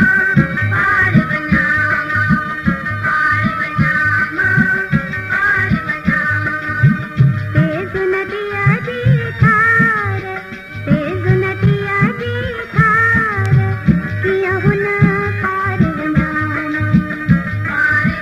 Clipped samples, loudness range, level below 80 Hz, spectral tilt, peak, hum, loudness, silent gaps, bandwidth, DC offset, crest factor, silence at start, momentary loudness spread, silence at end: under 0.1%; 2 LU; -36 dBFS; -8 dB/octave; 0 dBFS; none; -14 LUFS; none; 12 kHz; under 0.1%; 14 dB; 0 s; 6 LU; 0 s